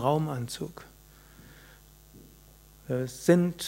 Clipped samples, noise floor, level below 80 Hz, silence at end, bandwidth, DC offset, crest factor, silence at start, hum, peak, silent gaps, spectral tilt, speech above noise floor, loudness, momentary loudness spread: under 0.1%; -55 dBFS; -58 dBFS; 0 s; 16 kHz; under 0.1%; 22 dB; 0 s; none; -8 dBFS; none; -6 dB/octave; 27 dB; -29 LUFS; 28 LU